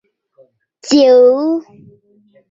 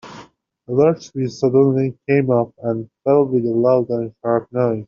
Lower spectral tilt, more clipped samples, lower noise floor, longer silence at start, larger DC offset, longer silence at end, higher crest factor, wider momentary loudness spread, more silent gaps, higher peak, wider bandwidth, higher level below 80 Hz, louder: second, -3.5 dB/octave vs -8.5 dB/octave; neither; first, -52 dBFS vs -45 dBFS; first, 0.85 s vs 0.05 s; neither; first, 0.9 s vs 0.05 s; about the same, 14 dB vs 16 dB; first, 14 LU vs 8 LU; neither; about the same, -2 dBFS vs -2 dBFS; about the same, 7.8 kHz vs 7.2 kHz; about the same, -64 dBFS vs -60 dBFS; first, -11 LUFS vs -18 LUFS